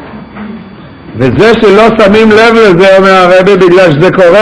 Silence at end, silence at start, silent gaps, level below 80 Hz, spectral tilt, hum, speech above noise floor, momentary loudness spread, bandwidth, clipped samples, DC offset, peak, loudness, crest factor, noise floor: 0 s; 0 s; none; -34 dBFS; -6 dB/octave; none; 25 dB; 20 LU; 11 kHz; 8%; under 0.1%; 0 dBFS; -3 LUFS; 4 dB; -27 dBFS